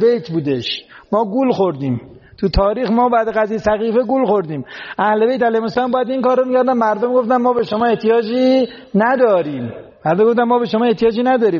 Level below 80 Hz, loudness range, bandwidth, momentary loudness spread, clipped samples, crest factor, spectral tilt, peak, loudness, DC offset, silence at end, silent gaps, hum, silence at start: -38 dBFS; 2 LU; 7 kHz; 8 LU; under 0.1%; 12 dB; -4.5 dB/octave; -4 dBFS; -16 LUFS; under 0.1%; 0 s; none; none; 0 s